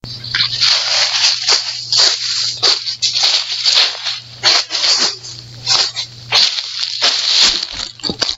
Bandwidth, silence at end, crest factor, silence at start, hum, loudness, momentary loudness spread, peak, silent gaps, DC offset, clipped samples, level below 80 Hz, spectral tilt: over 20 kHz; 0 s; 16 dB; 0.05 s; none; -12 LUFS; 10 LU; 0 dBFS; none; under 0.1%; under 0.1%; -50 dBFS; 0.5 dB/octave